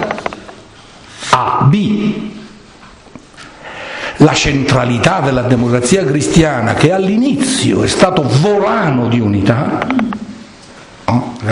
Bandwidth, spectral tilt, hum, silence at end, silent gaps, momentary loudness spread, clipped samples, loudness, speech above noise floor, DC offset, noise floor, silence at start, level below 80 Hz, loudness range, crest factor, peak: 11 kHz; -5.5 dB/octave; none; 0 s; none; 15 LU; 0.2%; -12 LUFS; 27 dB; under 0.1%; -38 dBFS; 0 s; -36 dBFS; 5 LU; 14 dB; 0 dBFS